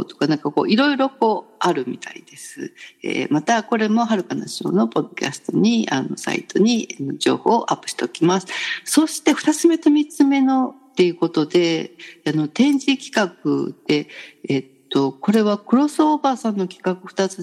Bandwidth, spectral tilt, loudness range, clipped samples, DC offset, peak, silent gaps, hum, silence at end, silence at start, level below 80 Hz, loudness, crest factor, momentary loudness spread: 12.5 kHz; -5 dB/octave; 4 LU; under 0.1%; under 0.1%; -2 dBFS; none; none; 0 s; 0 s; -76 dBFS; -20 LUFS; 16 dB; 9 LU